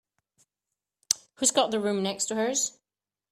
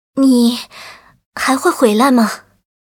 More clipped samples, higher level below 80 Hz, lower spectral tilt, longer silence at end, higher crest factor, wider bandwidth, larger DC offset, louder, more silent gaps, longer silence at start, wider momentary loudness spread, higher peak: neither; second, -74 dBFS vs -58 dBFS; second, -2 dB/octave vs -4 dB/octave; about the same, 0.6 s vs 0.55 s; first, 26 dB vs 14 dB; second, 15.5 kHz vs 18 kHz; neither; second, -26 LUFS vs -13 LUFS; second, none vs 1.26-1.32 s; first, 1.1 s vs 0.15 s; second, 6 LU vs 20 LU; second, -4 dBFS vs 0 dBFS